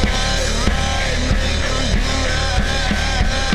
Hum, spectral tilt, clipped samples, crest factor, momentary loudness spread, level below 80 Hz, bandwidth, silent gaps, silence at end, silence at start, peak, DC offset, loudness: none; -4 dB/octave; under 0.1%; 16 dB; 1 LU; -20 dBFS; 13 kHz; none; 0 s; 0 s; -2 dBFS; under 0.1%; -19 LUFS